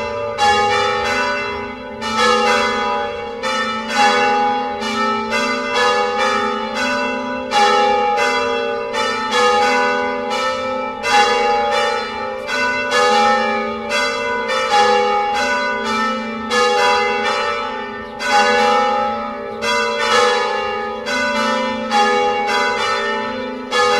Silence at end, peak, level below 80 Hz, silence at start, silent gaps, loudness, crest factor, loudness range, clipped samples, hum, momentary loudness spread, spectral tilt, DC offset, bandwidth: 0 s; 0 dBFS; -50 dBFS; 0 s; none; -17 LUFS; 18 dB; 1 LU; under 0.1%; none; 8 LU; -2 dB/octave; under 0.1%; 13.5 kHz